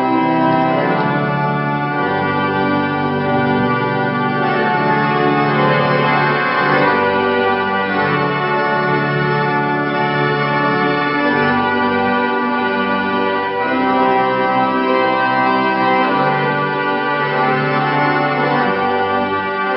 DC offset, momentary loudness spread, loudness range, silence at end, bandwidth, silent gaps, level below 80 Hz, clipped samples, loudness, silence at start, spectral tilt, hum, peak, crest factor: under 0.1%; 3 LU; 2 LU; 0 s; 5.8 kHz; none; -54 dBFS; under 0.1%; -15 LUFS; 0 s; -11.5 dB/octave; none; -2 dBFS; 14 dB